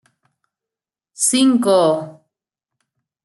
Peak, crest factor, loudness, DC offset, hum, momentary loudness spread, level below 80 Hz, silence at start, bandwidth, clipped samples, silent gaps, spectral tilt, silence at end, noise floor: -4 dBFS; 18 dB; -15 LUFS; under 0.1%; none; 10 LU; -70 dBFS; 1.2 s; 12.5 kHz; under 0.1%; none; -3.5 dB/octave; 1.15 s; -88 dBFS